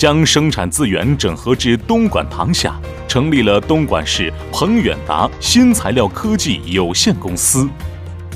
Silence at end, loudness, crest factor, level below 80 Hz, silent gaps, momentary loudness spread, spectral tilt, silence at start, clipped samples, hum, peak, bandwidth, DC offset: 0 s; -14 LUFS; 14 dB; -30 dBFS; none; 7 LU; -4 dB/octave; 0 s; under 0.1%; none; 0 dBFS; 16 kHz; under 0.1%